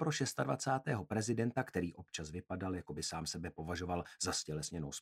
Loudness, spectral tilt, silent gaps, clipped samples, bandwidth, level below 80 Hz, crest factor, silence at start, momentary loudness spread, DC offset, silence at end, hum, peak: -39 LUFS; -4.5 dB/octave; none; under 0.1%; 16 kHz; -62 dBFS; 18 dB; 0 s; 7 LU; under 0.1%; 0 s; none; -20 dBFS